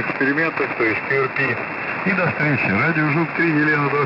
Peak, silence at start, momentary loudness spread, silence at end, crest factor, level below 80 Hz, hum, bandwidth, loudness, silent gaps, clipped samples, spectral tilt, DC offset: -8 dBFS; 0 s; 3 LU; 0 s; 12 dB; -60 dBFS; none; 5.8 kHz; -19 LUFS; none; under 0.1%; -8.5 dB/octave; under 0.1%